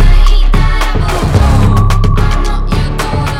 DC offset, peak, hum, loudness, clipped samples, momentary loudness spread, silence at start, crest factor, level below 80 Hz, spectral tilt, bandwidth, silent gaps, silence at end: under 0.1%; 0 dBFS; none; -12 LUFS; 0.6%; 6 LU; 0 s; 8 dB; -10 dBFS; -6 dB/octave; 12 kHz; none; 0 s